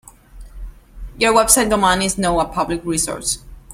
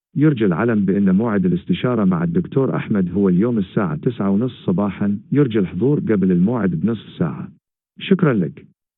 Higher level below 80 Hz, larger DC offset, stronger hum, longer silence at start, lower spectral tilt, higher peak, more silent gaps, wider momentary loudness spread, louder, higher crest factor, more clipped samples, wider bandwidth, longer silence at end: first, -36 dBFS vs -54 dBFS; neither; neither; first, 0.35 s vs 0.15 s; second, -2.5 dB/octave vs -13 dB/octave; about the same, 0 dBFS vs -2 dBFS; neither; first, 10 LU vs 7 LU; about the same, -16 LUFS vs -18 LUFS; about the same, 18 dB vs 16 dB; neither; first, 16.5 kHz vs 4 kHz; second, 0 s vs 0.4 s